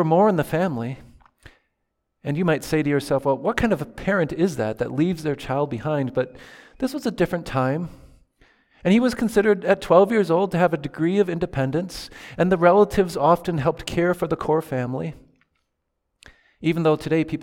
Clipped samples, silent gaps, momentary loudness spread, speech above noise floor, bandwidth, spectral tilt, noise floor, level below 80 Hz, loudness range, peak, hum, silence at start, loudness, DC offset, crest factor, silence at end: under 0.1%; none; 11 LU; 55 dB; 17 kHz; -7 dB/octave; -76 dBFS; -48 dBFS; 6 LU; -2 dBFS; none; 0 s; -22 LUFS; under 0.1%; 20 dB; 0 s